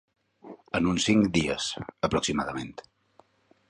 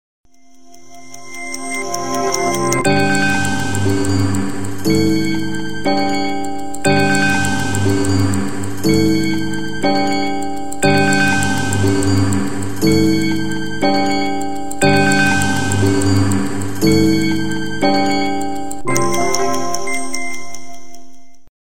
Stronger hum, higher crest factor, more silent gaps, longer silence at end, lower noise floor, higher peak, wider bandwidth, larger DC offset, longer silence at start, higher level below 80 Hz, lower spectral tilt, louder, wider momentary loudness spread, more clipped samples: neither; about the same, 20 dB vs 18 dB; neither; first, 1 s vs 0.2 s; first, -62 dBFS vs -46 dBFS; second, -10 dBFS vs 0 dBFS; second, 11 kHz vs 17 kHz; second, under 0.1% vs 9%; first, 0.45 s vs 0.25 s; second, -50 dBFS vs -42 dBFS; about the same, -4.5 dB/octave vs -4.5 dB/octave; second, -27 LUFS vs -17 LUFS; first, 13 LU vs 10 LU; neither